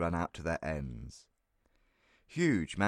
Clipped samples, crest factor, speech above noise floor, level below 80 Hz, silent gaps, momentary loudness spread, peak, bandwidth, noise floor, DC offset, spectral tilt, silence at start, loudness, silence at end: under 0.1%; 20 dB; 40 dB; -52 dBFS; none; 15 LU; -16 dBFS; 11.5 kHz; -74 dBFS; under 0.1%; -6 dB/octave; 0 s; -35 LUFS; 0 s